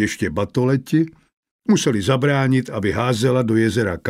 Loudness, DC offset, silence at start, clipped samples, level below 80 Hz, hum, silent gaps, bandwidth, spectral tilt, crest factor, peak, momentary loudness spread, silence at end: -19 LUFS; under 0.1%; 0 s; under 0.1%; -48 dBFS; none; 1.33-1.43 s, 1.51-1.59 s; 15.5 kHz; -6 dB/octave; 14 dB; -4 dBFS; 5 LU; 0 s